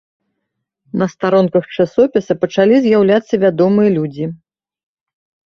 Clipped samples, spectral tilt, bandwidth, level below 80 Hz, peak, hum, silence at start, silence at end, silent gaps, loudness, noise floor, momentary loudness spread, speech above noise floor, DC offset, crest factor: under 0.1%; -7.5 dB/octave; 6.8 kHz; -56 dBFS; 0 dBFS; none; 0.95 s; 1.15 s; none; -14 LUFS; -75 dBFS; 9 LU; 62 dB; under 0.1%; 14 dB